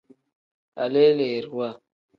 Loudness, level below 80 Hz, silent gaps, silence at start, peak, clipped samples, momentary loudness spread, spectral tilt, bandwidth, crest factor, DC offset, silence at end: -23 LUFS; -74 dBFS; none; 0.75 s; -6 dBFS; under 0.1%; 14 LU; -8 dB/octave; 5.4 kHz; 18 dB; under 0.1%; 0.4 s